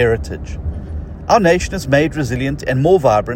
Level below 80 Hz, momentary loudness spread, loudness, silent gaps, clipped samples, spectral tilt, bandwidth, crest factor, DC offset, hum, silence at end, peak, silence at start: -30 dBFS; 15 LU; -16 LUFS; none; under 0.1%; -6 dB/octave; 16.5 kHz; 16 dB; under 0.1%; none; 0 s; 0 dBFS; 0 s